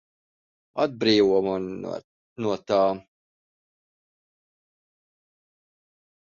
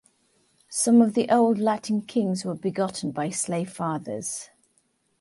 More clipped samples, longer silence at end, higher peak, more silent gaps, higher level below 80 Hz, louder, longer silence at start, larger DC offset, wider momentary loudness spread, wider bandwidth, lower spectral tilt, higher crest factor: neither; first, 3.2 s vs 0.75 s; about the same, -6 dBFS vs -8 dBFS; first, 2.04-2.36 s vs none; first, -64 dBFS vs -70 dBFS; about the same, -24 LUFS vs -24 LUFS; about the same, 0.75 s vs 0.7 s; neither; first, 16 LU vs 12 LU; second, 7.2 kHz vs 11.5 kHz; about the same, -6 dB/octave vs -5 dB/octave; about the same, 22 dB vs 18 dB